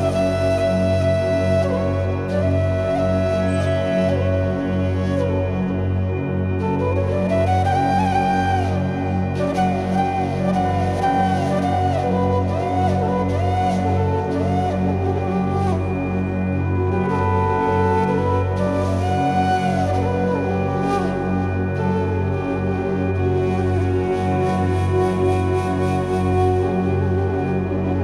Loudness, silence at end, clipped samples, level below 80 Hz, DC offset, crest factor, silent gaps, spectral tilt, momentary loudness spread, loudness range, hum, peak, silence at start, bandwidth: -20 LUFS; 0 s; under 0.1%; -40 dBFS; under 0.1%; 12 dB; none; -8 dB/octave; 3 LU; 1 LU; none; -6 dBFS; 0 s; 11 kHz